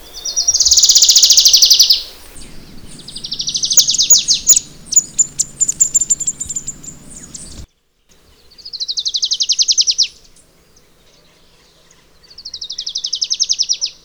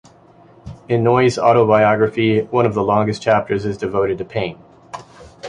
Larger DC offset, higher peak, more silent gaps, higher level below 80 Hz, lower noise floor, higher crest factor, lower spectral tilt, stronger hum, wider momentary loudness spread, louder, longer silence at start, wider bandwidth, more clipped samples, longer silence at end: neither; about the same, 0 dBFS vs 0 dBFS; neither; about the same, -44 dBFS vs -48 dBFS; first, -55 dBFS vs -47 dBFS; about the same, 16 dB vs 16 dB; second, 2.5 dB/octave vs -7 dB/octave; neither; first, 23 LU vs 13 LU; first, -10 LUFS vs -16 LUFS; second, 0.05 s vs 0.65 s; first, over 20 kHz vs 10.5 kHz; neither; first, 0.15 s vs 0 s